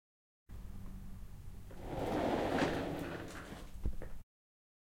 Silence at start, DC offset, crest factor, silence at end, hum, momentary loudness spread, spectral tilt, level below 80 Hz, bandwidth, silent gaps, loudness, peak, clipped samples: 0.5 s; under 0.1%; 20 dB; 0.8 s; none; 19 LU; -6 dB/octave; -50 dBFS; 16.5 kHz; none; -39 LUFS; -20 dBFS; under 0.1%